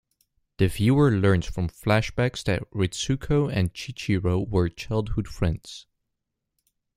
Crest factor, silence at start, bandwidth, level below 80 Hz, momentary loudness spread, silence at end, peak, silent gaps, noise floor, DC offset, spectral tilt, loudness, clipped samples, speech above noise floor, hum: 20 dB; 0.6 s; 14.5 kHz; -42 dBFS; 10 LU; 1.15 s; -4 dBFS; none; -81 dBFS; under 0.1%; -6.5 dB/octave; -25 LUFS; under 0.1%; 58 dB; none